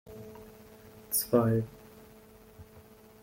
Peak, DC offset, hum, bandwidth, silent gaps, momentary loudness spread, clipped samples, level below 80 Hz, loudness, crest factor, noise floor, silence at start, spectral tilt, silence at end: -12 dBFS; under 0.1%; none; 16.5 kHz; none; 27 LU; under 0.1%; -60 dBFS; -29 LUFS; 24 dB; -55 dBFS; 0.05 s; -5.5 dB/octave; 0.4 s